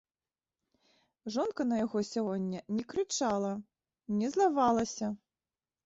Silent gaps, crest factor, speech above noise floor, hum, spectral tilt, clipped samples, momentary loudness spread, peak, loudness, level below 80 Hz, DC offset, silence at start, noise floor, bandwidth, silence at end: none; 18 dB; over 58 dB; none; -5 dB/octave; under 0.1%; 10 LU; -16 dBFS; -32 LUFS; -70 dBFS; under 0.1%; 1.25 s; under -90 dBFS; 8 kHz; 0.7 s